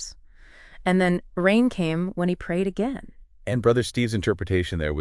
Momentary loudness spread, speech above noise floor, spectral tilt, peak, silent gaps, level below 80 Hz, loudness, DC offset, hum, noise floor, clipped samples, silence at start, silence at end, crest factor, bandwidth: 8 LU; 25 dB; -6.5 dB/octave; -8 dBFS; none; -44 dBFS; -24 LUFS; under 0.1%; none; -48 dBFS; under 0.1%; 0 s; 0 s; 16 dB; 12 kHz